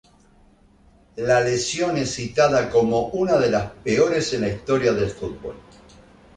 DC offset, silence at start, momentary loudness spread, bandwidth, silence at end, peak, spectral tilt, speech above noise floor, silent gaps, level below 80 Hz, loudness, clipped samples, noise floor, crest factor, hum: under 0.1%; 1.15 s; 11 LU; 10.5 kHz; 0.75 s; -4 dBFS; -5 dB/octave; 34 dB; none; -48 dBFS; -21 LUFS; under 0.1%; -54 dBFS; 18 dB; none